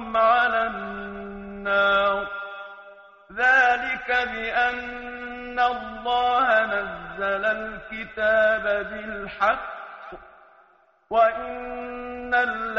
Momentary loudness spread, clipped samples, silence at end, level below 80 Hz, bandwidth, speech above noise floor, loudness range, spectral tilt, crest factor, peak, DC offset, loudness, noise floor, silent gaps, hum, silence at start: 16 LU; under 0.1%; 0 s; -52 dBFS; 7.4 kHz; 35 dB; 4 LU; -0.5 dB/octave; 16 dB; -8 dBFS; under 0.1%; -23 LUFS; -59 dBFS; none; none; 0 s